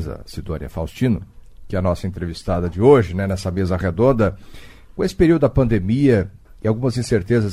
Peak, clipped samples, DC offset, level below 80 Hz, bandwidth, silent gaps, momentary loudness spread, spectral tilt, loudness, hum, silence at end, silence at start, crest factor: 0 dBFS; under 0.1%; under 0.1%; -34 dBFS; 15 kHz; none; 14 LU; -7.5 dB/octave; -19 LUFS; none; 0 s; 0 s; 18 dB